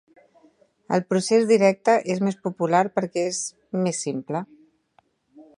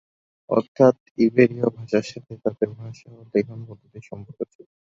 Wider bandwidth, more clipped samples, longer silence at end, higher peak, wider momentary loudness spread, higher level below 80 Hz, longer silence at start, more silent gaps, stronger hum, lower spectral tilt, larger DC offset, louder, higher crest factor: first, 11.5 kHz vs 7.8 kHz; neither; second, 0.15 s vs 0.4 s; about the same, -4 dBFS vs -2 dBFS; second, 11 LU vs 22 LU; second, -74 dBFS vs -62 dBFS; first, 0.9 s vs 0.5 s; second, none vs 0.68-0.75 s, 1.00-1.15 s; neither; second, -5 dB/octave vs -7.5 dB/octave; neither; about the same, -23 LUFS vs -22 LUFS; about the same, 18 dB vs 22 dB